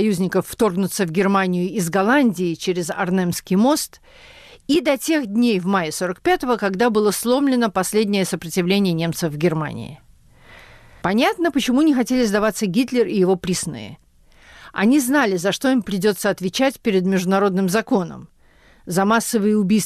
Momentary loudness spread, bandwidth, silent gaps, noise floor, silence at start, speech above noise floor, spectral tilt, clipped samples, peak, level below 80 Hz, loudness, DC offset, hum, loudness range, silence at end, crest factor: 6 LU; 15 kHz; none; -52 dBFS; 0 s; 33 dB; -5 dB/octave; under 0.1%; -8 dBFS; -52 dBFS; -19 LUFS; under 0.1%; none; 2 LU; 0 s; 12 dB